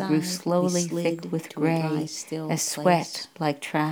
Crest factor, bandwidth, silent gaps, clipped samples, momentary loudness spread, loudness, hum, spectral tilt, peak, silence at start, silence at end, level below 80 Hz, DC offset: 20 dB; 19.5 kHz; none; under 0.1%; 8 LU; -26 LUFS; none; -5 dB/octave; -6 dBFS; 0 s; 0 s; -76 dBFS; under 0.1%